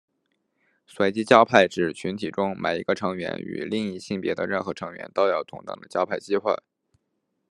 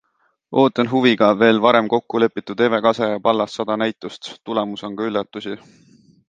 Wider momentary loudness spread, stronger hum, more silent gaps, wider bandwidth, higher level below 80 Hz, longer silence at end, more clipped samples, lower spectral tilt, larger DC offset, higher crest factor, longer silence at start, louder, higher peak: second, 13 LU vs 16 LU; neither; neither; first, 11.5 kHz vs 9 kHz; second, -70 dBFS vs -64 dBFS; first, 0.95 s vs 0.75 s; neither; about the same, -5.5 dB/octave vs -6 dB/octave; neither; first, 24 dB vs 18 dB; first, 0.95 s vs 0.5 s; second, -24 LUFS vs -18 LUFS; about the same, 0 dBFS vs 0 dBFS